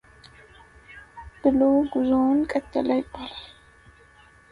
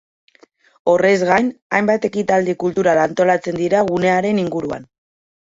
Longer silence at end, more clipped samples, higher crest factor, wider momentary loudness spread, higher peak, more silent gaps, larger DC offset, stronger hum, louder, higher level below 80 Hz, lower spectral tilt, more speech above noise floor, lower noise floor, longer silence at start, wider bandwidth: first, 1.05 s vs 0.75 s; neither; about the same, 18 dB vs 16 dB; first, 22 LU vs 8 LU; second, -8 dBFS vs -2 dBFS; second, none vs 1.62-1.70 s; neither; neither; second, -23 LUFS vs -17 LUFS; about the same, -52 dBFS vs -56 dBFS; about the same, -7 dB/octave vs -6 dB/octave; second, 32 dB vs 36 dB; about the same, -53 dBFS vs -53 dBFS; about the same, 0.9 s vs 0.85 s; first, 10.5 kHz vs 7.8 kHz